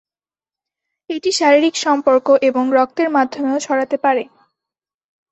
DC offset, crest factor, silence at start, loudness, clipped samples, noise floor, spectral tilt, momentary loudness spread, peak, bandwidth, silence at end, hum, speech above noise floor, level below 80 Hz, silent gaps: under 0.1%; 16 dB; 1.1 s; -16 LUFS; under 0.1%; under -90 dBFS; -2 dB/octave; 8 LU; -2 dBFS; 8.4 kHz; 1.05 s; none; over 75 dB; -66 dBFS; none